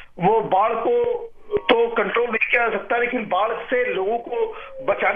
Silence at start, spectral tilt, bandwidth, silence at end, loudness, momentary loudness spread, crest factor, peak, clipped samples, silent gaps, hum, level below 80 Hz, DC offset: 0 s; -7.5 dB/octave; 4.7 kHz; 0 s; -21 LUFS; 8 LU; 20 dB; 0 dBFS; under 0.1%; none; none; -52 dBFS; under 0.1%